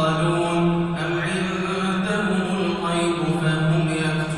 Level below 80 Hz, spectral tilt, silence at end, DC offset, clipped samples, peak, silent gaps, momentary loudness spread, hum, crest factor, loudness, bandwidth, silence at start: -48 dBFS; -6 dB/octave; 0 s; under 0.1%; under 0.1%; -8 dBFS; none; 3 LU; none; 12 dB; -22 LUFS; 11 kHz; 0 s